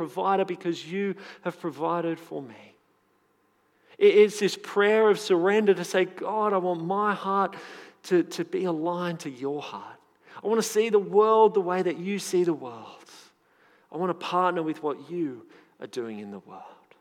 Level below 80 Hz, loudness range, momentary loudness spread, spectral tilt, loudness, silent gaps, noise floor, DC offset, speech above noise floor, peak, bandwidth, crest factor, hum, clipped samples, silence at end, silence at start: under -90 dBFS; 8 LU; 21 LU; -5 dB/octave; -26 LUFS; none; -67 dBFS; under 0.1%; 42 dB; -6 dBFS; 15 kHz; 20 dB; none; under 0.1%; 0.3 s; 0 s